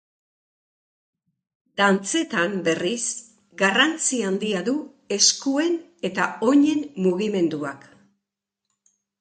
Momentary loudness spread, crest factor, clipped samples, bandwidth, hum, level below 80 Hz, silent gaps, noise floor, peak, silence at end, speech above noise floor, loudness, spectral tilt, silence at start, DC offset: 11 LU; 22 dB; under 0.1%; 9.4 kHz; none; -72 dBFS; none; -84 dBFS; -2 dBFS; 1.4 s; 62 dB; -22 LUFS; -3 dB/octave; 1.75 s; under 0.1%